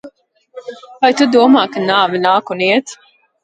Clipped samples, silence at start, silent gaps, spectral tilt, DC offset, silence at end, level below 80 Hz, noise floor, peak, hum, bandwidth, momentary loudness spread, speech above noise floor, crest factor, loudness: under 0.1%; 0.05 s; none; -4.5 dB/octave; under 0.1%; 0.5 s; -64 dBFS; -46 dBFS; 0 dBFS; none; 9 kHz; 22 LU; 33 dB; 14 dB; -13 LUFS